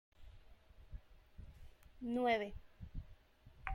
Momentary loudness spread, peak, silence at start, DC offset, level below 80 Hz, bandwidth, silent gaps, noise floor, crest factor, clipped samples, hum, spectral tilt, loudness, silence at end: 28 LU; -22 dBFS; 0.2 s; under 0.1%; -58 dBFS; 16 kHz; none; -64 dBFS; 22 dB; under 0.1%; none; -6.5 dB/octave; -41 LUFS; 0 s